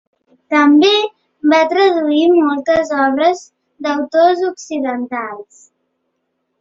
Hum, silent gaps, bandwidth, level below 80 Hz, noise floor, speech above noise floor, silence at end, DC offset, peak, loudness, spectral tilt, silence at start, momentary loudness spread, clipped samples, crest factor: none; none; 7.6 kHz; -58 dBFS; -70 dBFS; 56 dB; 1.2 s; under 0.1%; 0 dBFS; -14 LUFS; -3.5 dB/octave; 0.5 s; 13 LU; under 0.1%; 14 dB